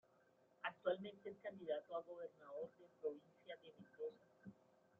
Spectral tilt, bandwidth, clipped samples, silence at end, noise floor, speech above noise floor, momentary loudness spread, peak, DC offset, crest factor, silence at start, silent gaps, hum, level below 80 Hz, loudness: -3 dB/octave; 7.2 kHz; under 0.1%; 0.45 s; -76 dBFS; 24 dB; 18 LU; -30 dBFS; under 0.1%; 22 dB; 0.6 s; none; none; under -90 dBFS; -50 LUFS